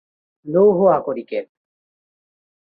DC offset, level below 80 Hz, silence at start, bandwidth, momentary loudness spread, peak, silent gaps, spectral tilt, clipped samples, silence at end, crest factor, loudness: under 0.1%; -64 dBFS; 0.45 s; 4.7 kHz; 14 LU; -4 dBFS; none; -11 dB/octave; under 0.1%; 1.3 s; 18 dB; -17 LUFS